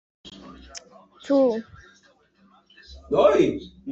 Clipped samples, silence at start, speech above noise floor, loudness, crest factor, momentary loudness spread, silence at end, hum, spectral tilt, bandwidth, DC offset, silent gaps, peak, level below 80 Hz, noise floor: under 0.1%; 0.25 s; 39 dB; -22 LUFS; 20 dB; 26 LU; 0 s; none; -6 dB/octave; 8 kHz; under 0.1%; none; -6 dBFS; -54 dBFS; -59 dBFS